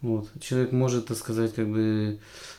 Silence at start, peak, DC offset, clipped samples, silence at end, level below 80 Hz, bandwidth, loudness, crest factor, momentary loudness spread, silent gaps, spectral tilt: 0 s; -12 dBFS; under 0.1%; under 0.1%; 0 s; -58 dBFS; 15.5 kHz; -27 LUFS; 14 dB; 7 LU; none; -6.5 dB/octave